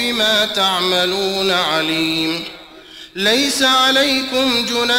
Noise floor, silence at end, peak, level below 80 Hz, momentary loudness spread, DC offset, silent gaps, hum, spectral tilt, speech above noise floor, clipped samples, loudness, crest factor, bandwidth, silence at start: -39 dBFS; 0 s; -4 dBFS; -52 dBFS; 7 LU; under 0.1%; none; none; -2 dB/octave; 22 dB; under 0.1%; -15 LUFS; 12 dB; 16.5 kHz; 0 s